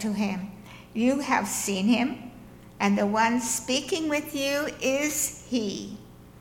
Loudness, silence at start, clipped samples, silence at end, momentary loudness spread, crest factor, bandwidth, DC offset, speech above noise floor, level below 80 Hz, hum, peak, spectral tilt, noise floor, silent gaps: -26 LUFS; 0 s; under 0.1%; 0.1 s; 14 LU; 18 dB; 17 kHz; under 0.1%; 21 dB; -56 dBFS; 60 Hz at -50 dBFS; -10 dBFS; -3.5 dB/octave; -47 dBFS; none